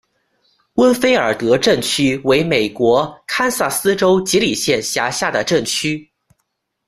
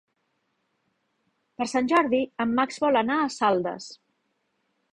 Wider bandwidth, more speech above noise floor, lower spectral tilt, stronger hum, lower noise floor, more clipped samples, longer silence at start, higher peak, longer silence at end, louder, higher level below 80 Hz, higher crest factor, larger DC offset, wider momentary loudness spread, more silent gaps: first, 15.5 kHz vs 10.5 kHz; first, 56 dB vs 50 dB; about the same, -3.5 dB/octave vs -4.5 dB/octave; neither; about the same, -72 dBFS vs -75 dBFS; neither; second, 0.75 s vs 1.6 s; first, 0 dBFS vs -8 dBFS; second, 0.85 s vs 1 s; first, -16 LUFS vs -24 LUFS; first, -50 dBFS vs -68 dBFS; about the same, 16 dB vs 18 dB; neither; second, 5 LU vs 11 LU; neither